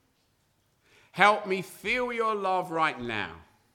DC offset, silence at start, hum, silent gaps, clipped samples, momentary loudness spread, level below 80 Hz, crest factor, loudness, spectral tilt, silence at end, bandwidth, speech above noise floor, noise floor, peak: under 0.1%; 1.15 s; none; none; under 0.1%; 11 LU; -62 dBFS; 26 dB; -27 LUFS; -4 dB/octave; 0.3 s; 19 kHz; 43 dB; -70 dBFS; -4 dBFS